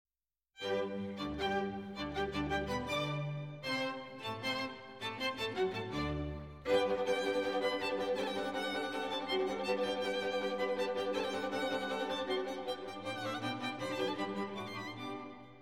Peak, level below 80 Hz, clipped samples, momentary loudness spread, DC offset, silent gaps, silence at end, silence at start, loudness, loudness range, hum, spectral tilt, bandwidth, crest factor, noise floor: -20 dBFS; -58 dBFS; under 0.1%; 8 LU; under 0.1%; none; 0 s; 0.55 s; -37 LUFS; 3 LU; none; -5 dB/octave; 16 kHz; 16 dB; -87 dBFS